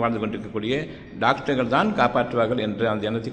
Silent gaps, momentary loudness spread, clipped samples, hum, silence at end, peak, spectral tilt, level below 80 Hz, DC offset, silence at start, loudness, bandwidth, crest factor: none; 7 LU; under 0.1%; none; 0 s; -4 dBFS; -7 dB/octave; -50 dBFS; under 0.1%; 0 s; -23 LUFS; 9.2 kHz; 20 dB